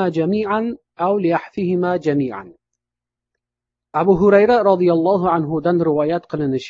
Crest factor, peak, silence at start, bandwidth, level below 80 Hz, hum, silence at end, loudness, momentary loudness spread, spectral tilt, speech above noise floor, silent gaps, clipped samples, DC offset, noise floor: 16 dB; -2 dBFS; 0 s; 7.4 kHz; -52 dBFS; 60 Hz at -55 dBFS; 0 s; -17 LUFS; 9 LU; -8.5 dB/octave; 69 dB; none; under 0.1%; under 0.1%; -86 dBFS